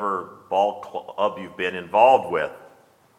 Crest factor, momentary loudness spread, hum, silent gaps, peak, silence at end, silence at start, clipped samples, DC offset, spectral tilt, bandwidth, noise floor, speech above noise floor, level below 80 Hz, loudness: 20 dB; 15 LU; none; none; -2 dBFS; 0.6 s; 0 s; under 0.1%; under 0.1%; -5 dB/octave; 12 kHz; -55 dBFS; 34 dB; -68 dBFS; -22 LUFS